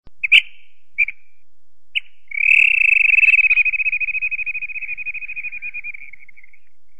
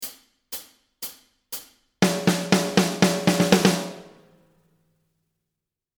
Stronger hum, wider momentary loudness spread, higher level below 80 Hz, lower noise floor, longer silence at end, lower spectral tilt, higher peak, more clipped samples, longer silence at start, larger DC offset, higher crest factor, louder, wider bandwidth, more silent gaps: neither; about the same, 17 LU vs 17 LU; about the same, -60 dBFS vs -60 dBFS; second, -68 dBFS vs -85 dBFS; second, 0.95 s vs 1.9 s; second, 2 dB/octave vs -4.5 dB/octave; about the same, 0 dBFS vs 0 dBFS; neither; about the same, 0 s vs 0 s; first, 3% vs under 0.1%; about the same, 20 dB vs 24 dB; first, -14 LUFS vs -21 LUFS; second, 9.8 kHz vs over 20 kHz; neither